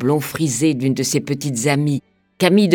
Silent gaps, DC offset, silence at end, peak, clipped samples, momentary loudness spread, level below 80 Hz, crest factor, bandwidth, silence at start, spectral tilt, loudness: none; under 0.1%; 0 s; 0 dBFS; under 0.1%; 6 LU; -60 dBFS; 18 dB; 19 kHz; 0 s; -5 dB/octave; -19 LUFS